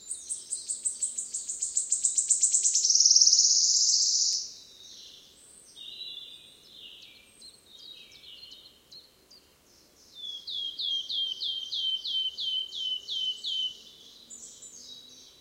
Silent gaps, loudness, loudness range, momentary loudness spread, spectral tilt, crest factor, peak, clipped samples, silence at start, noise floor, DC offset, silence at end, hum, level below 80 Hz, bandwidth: none; -24 LUFS; 24 LU; 27 LU; 4 dB/octave; 24 dB; -8 dBFS; under 0.1%; 0 s; -60 dBFS; under 0.1%; 0.15 s; none; -76 dBFS; 16 kHz